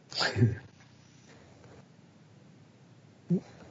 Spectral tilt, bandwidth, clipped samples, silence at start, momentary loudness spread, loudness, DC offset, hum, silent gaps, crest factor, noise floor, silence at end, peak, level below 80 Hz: -5 dB/octave; 7.6 kHz; under 0.1%; 0.1 s; 28 LU; -31 LUFS; under 0.1%; none; none; 24 dB; -57 dBFS; 0.05 s; -12 dBFS; -68 dBFS